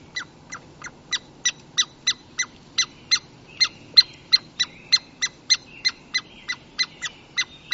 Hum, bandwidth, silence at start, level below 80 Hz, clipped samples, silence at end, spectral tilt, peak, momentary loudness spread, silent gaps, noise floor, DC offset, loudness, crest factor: none; 8 kHz; 0.15 s; -60 dBFS; under 0.1%; 0 s; 1.5 dB/octave; 0 dBFS; 16 LU; none; -42 dBFS; under 0.1%; -22 LUFS; 26 dB